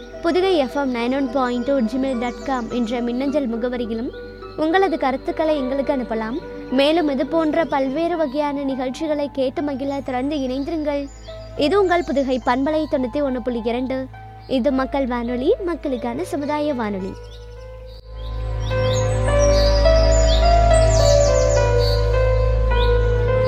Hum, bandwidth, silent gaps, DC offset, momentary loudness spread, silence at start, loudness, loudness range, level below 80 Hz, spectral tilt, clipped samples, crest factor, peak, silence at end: none; 10 kHz; none; under 0.1%; 12 LU; 0 s; -20 LUFS; 7 LU; -26 dBFS; -6 dB/octave; under 0.1%; 16 dB; -2 dBFS; 0 s